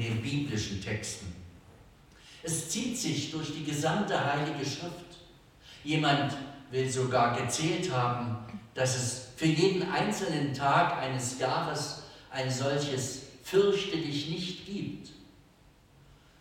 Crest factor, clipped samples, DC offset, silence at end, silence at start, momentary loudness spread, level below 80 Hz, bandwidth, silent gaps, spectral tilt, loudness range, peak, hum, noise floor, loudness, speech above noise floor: 18 dB; under 0.1%; under 0.1%; 1.15 s; 0 s; 14 LU; -60 dBFS; 16.5 kHz; none; -4.5 dB/octave; 4 LU; -12 dBFS; none; -60 dBFS; -31 LUFS; 30 dB